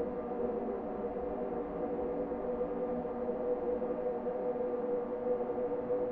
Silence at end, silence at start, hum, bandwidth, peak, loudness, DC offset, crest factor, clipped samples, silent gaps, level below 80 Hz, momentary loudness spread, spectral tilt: 0 s; 0 s; none; 3.6 kHz; -24 dBFS; -36 LUFS; under 0.1%; 12 dB; under 0.1%; none; -58 dBFS; 3 LU; -8 dB/octave